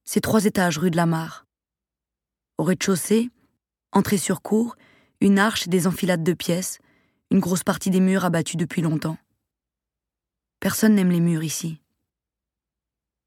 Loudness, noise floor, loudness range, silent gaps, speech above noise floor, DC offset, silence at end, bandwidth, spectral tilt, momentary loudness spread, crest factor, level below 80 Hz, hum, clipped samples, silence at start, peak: -22 LUFS; -89 dBFS; 3 LU; none; 68 dB; under 0.1%; 1.5 s; 17.5 kHz; -5.5 dB/octave; 11 LU; 20 dB; -58 dBFS; none; under 0.1%; 0.05 s; -4 dBFS